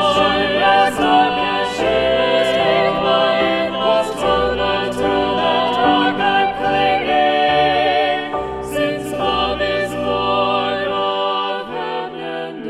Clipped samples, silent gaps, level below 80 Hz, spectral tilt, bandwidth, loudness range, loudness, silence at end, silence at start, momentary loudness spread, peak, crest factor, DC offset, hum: under 0.1%; none; -42 dBFS; -4.5 dB/octave; 13.5 kHz; 4 LU; -17 LUFS; 0 s; 0 s; 7 LU; -2 dBFS; 16 dB; under 0.1%; none